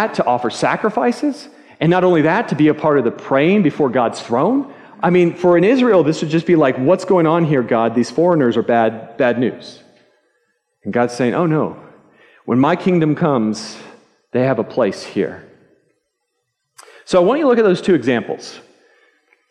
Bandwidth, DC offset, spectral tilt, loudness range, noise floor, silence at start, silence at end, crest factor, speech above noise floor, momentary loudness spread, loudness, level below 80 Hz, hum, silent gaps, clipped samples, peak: 10.5 kHz; under 0.1%; -7 dB/octave; 6 LU; -72 dBFS; 0 s; 0.9 s; 14 dB; 57 dB; 9 LU; -16 LUFS; -62 dBFS; none; none; under 0.1%; -2 dBFS